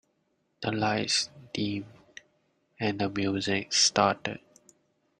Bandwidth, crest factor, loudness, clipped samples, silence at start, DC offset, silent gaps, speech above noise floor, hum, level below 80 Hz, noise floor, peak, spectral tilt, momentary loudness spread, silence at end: 11 kHz; 22 dB; -28 LUFS; under 0.1%; 0.6 s; under 0.1%; none; 46 dB; none; -66 dBFS; -74 dBFS; -8 dBFS; -3 dB/octave; 14 LU; 0.85 s